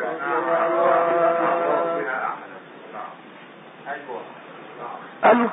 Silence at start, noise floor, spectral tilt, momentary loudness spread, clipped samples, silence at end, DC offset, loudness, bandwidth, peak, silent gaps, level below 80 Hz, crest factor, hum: 0 s; -43 dBFS; -9.5 dB/octave; 22 LU; under 0.1%; 0 s; under 0.1%; -21 LUFS; 3.9 kHz; -4 dBFS; none; -80 dBFS; 18 dB; none